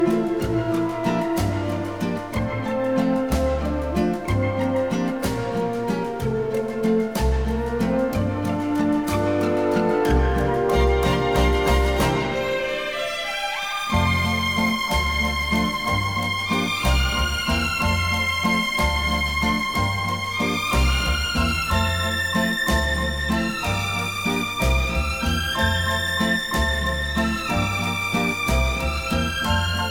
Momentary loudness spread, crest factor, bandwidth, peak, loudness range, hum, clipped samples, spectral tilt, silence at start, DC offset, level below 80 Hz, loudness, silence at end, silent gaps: 5 LU; 16 dB; 20 kHz; -6 dBFS; 3 LU; none; under 0.1%; -5 dB/octave; 0 s; 0.4%; -30 dBFS; -22 LUFS; 0 s; none